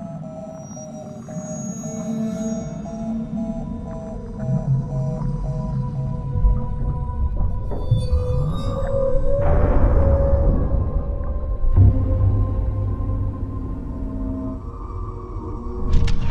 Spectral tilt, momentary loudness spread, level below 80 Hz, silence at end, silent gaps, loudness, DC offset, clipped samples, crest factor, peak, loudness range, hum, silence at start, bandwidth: -8 dB/octave; 13 LU; -24 dBFS; 0 s; none; -24 LUFS; under 0.1%; under 0.1%; 16 dB; -4 dBFS; 8 LU; none; 0 s; 9.6 kHz